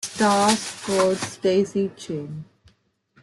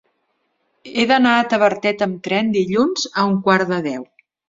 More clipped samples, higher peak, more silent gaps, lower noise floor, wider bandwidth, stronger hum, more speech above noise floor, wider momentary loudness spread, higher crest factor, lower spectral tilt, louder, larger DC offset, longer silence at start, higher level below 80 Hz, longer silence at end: neither; about the same, -4 dBFS vs -2 dBFS; neither; second, -63 dBFS vs -69 dBFS; first, 12.5 kHz vs 7.8 kHz; neither; second, 41 dB vs 51 dB; first, 13 LU vs 8 LU; about the same, 18 dB vs 18 dB; about the same, -4 dB/octave vs -5 dB/octave; second, -22 LUFS vs -17 LUFS; neither; second, 0 s vs 0.85 s; about the same, -62 dBFS vs -62 dBFS; first, 0.8 s vs 0.45 s